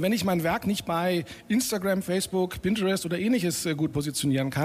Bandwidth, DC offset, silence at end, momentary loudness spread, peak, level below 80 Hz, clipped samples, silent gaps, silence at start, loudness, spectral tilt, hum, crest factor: 15.5 kHz; under 0.1%; 0 s; 3 LU; -14 dBFS; -54 dBFS; under 0.1%; none; 0 s; -27 LUFS; -5 dB/octave; none; 12 dB